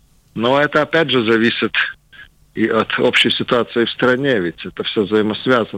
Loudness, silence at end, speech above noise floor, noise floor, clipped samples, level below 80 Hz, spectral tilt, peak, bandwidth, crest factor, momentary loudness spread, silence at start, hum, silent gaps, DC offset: -16 LUFS; 0 s; 28 dB; -44 dBFS; under 0.1%; -54 dBFS; -5.5 dB/octave; -4 dBFS; 16.5 kHz; 14 dB; 7 LU; 0.35 s; none; none; under 0.1%